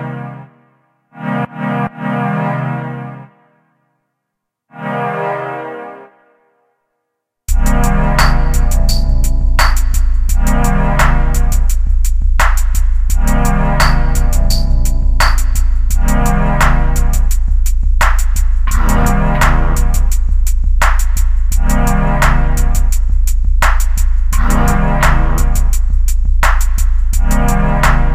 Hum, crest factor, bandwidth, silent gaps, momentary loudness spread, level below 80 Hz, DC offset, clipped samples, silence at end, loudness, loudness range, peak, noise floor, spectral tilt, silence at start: none; 10 dB; 15.5 kHz; none; 6 LU; -12 dBFS; under 0.1%; under 0.1%; 0 s; -15 LUFS; 7 LU; 0 dBFS; -75 dBFS; -5 dB/octave; 0 s